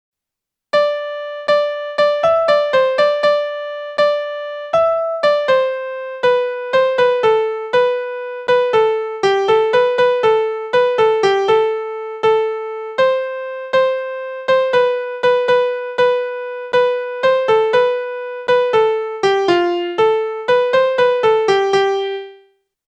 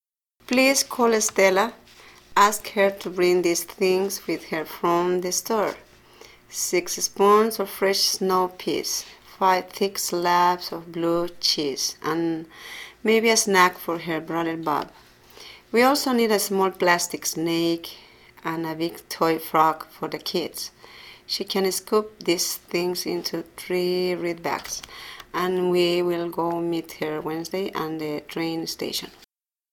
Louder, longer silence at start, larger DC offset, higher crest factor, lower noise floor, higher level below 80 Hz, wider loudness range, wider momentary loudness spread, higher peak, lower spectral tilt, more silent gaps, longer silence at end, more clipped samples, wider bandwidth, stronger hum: first, -16 LUFS vs -23 LUFS; first, 0.75 s vs 0.5 s; neither; second, 14 dB vs 22 dB; first, -84 dBFS vs -59 dBFS; about the same, -60 dBFS vs -62 dBFS; about the same, 2 LU vs 4 LU; about the same, 10 LU vs 12 LU; about the same, -2 dBFS vs -2 dBFS; about the same, -4 dB/octave vs -3 dB/octave; neither; about the same, 0.55 s vs 0.65 s; neither; second, 8.6 kHz vs 19 kHz; neither